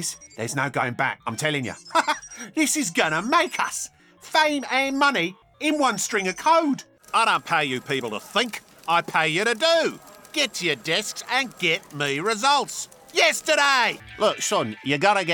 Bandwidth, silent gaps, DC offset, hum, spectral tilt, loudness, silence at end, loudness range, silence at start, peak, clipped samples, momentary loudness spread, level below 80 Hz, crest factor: 19 kHz; none; under 0.1%; none; -2.5 dB/octave; -22 LUFS; 0 s; 2 LU; 0 s; -6 dBFS; under 0.1%; 9 LU; -66 dBFS; 18 dB